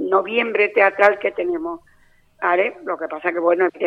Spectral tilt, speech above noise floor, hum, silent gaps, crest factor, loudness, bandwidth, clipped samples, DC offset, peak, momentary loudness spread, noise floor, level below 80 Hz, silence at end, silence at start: -5.5 dB/octave; 36 dB; none; none; 20 dB; -19 LUFS; 7.2 kHz; under 0.1%; under 0.1%; 0 dBFS; 12 LU; -55 dBFS; -62 dBFS; 0 s; 0 s